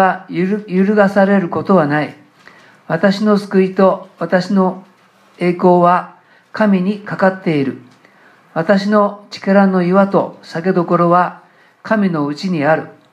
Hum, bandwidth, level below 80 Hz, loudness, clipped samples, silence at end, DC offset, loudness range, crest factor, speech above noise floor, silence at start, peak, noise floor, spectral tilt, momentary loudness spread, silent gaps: none; 9.2 kHz; -66 dBFS; -15 LUFS; under 0.1%; 0.2 s; under 0.1%; 2 LU; 14 dB; 36 dB; 0 s; 0 dBFS; -49 dBFS; -8 dB/octave; 10 LU; none